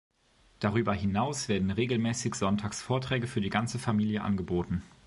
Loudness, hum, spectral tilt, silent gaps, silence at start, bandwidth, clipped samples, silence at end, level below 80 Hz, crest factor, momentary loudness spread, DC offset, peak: -30 LUFS; none; -5.5 dB/octave; none; 0.6 s; 11.5 kHz; under 0.1%; 0.2 s; -50 dBFS; 20 dB; 3 LU; under 0.1%; -10 dBFS